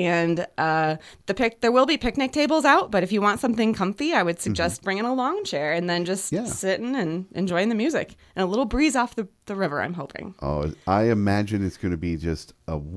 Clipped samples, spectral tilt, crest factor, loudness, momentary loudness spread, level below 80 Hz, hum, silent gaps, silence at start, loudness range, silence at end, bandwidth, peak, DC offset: under 0.1%; -5 dB/octave; 20 dB; -24 LUFS; 10 LU; -44 dBFS; none; none; 0 s; 4 LU; 0 s; 11 kHz; -4 dBFS; under 0.1%